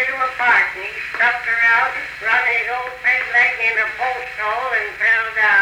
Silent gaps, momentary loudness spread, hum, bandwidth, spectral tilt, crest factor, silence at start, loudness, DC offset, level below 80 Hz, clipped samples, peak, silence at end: none; 9 LU; none; over 20 kHz; -1.5 dB/octave; 14 dB; 0 s; -16 LUFS; under 0.1%; -54 dBFS; under 0.1%; -4 dBFS; 0 s